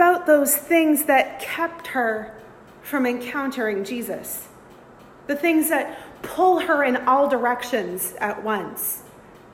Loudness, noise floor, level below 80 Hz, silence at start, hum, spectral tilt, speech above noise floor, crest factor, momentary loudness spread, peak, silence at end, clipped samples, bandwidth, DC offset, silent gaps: -22 LUFS; -46 dBFS; -62 dBFS; 0 s; none; -3 dB/octave; 25 dB; 18 dB; 14 LU; -4 dBFS; 0.15 s; under 0.1%; 16.5 kHz; under 0.1%; none